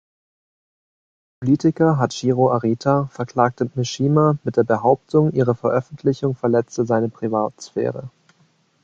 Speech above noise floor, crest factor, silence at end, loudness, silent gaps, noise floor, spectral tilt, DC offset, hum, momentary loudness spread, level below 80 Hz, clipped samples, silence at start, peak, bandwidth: 41 dB; 18 dB; 0.75 s; -20 LUFS; none; -60 dBFS; -7.5 dB/octave; under 0.1%; none; 7 LU; -56 dBFS; under 0.1%; 1.4 s; -2 dBFS; 7.8 kHz